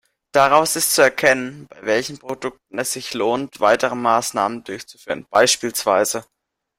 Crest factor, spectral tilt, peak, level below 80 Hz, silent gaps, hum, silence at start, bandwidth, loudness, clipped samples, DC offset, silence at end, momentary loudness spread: 18 dB; -2 dB/octave; 0 dBFS; -60 dBFS; none; none; 0.35 s; 16 kHz; -18 LUFS; under 0.1%; under 0.1%; 0.55 s; 14 LU